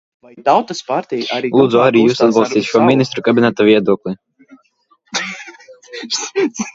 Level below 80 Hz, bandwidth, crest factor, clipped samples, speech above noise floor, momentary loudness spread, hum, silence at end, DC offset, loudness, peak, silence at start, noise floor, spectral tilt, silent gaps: -60 dBFS; 7.8 kHz; 16 dB; under 0.1%; 44 dB; 15 LU; none; 0.05 s; under 0.1%; -14 LUFS; 0 dBFS; 0.35 s; -57 dBFS; -5 dB/octave; none